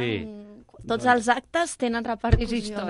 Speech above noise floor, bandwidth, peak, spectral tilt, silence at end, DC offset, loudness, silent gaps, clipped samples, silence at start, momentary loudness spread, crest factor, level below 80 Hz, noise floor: 20 dB; 11.5 kHz; -4 dBFS; -5 dB/octave; 0 s; under 0.1%; -25 LUFS; none; under 0.1%; 0 s; 16 LU; 22 dB; -34 dBFS; -45 dBFS